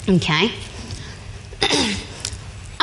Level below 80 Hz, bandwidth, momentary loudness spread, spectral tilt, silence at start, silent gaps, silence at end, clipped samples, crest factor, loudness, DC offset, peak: -38 dBFS; 11.5 kHz; 18 LU; -4 dB/octave; 0 s; none; 0 s; under 0.1%; 20 dB; -20 LUFS; under 0.1%; -2 dBFS